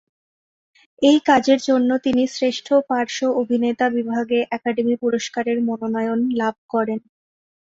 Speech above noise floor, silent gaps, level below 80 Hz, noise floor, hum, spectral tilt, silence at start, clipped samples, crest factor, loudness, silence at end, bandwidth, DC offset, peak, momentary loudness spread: over 71 dB; 6.58-6.69 s; -62 dBFS; under -90 dBFS; none; -4.5 dB/octave; 1 s; under 0.1%; 18 dB; -20 LUFS; 0.75 s; 7.8 kHz; under 0.1%; -2 dBFS; 7 LU